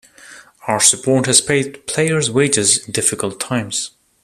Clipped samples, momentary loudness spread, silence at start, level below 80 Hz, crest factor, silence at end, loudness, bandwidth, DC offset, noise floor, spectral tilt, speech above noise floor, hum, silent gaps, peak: under 0.1%; 10 LU; 0.25 s; -54 dBFS; 18 dB; 0.35 s; -15 LUFS; 15 kHz; under 0.1%; -42 dBFS; -2.5 dB/octave; 25 dB; none; none; 0 dBFS